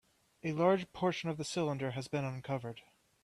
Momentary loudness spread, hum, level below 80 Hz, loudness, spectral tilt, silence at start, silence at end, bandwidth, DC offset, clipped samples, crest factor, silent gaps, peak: 11 LU; none; -72 dBFS; -36 LUFS; -6 dB/octave; 0.45 s; 0.45 s; 13 kHz; under 0.1%; under 0.1%; 20 dB; none; -16 dBFS